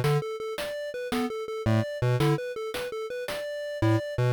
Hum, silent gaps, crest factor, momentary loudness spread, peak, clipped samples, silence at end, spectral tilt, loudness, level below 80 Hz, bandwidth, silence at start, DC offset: none; none; 12 dB; 8 LU; -16 dBFS; under 0.1%; 0 s; -6.5 dB/octave; -29 LUFS; -52 dBFS; 19.5 kHz; 0 s; under 0.1%